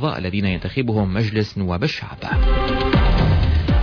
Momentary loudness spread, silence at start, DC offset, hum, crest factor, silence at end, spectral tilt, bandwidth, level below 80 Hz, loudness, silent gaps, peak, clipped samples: 6 LU; 0 s; under 0.1%; none; 12 dB; 0 s; -8 dB/octave; 5.4 kHz; -22 dBFS; -20 LUFS; none; -6 dBFS; under 0.1%